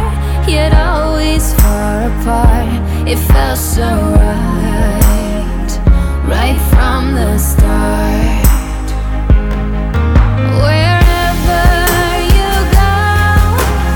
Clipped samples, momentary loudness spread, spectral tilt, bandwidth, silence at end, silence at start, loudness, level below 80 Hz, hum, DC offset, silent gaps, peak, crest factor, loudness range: under 0.1%; 5 LU; -5.5 dB/octave; 19 kHz; 0 s; 0 s; -12 LUFS; -12 dBFS; none; under 0.1%; none; 0 dBFS; 10 dB; 2 LU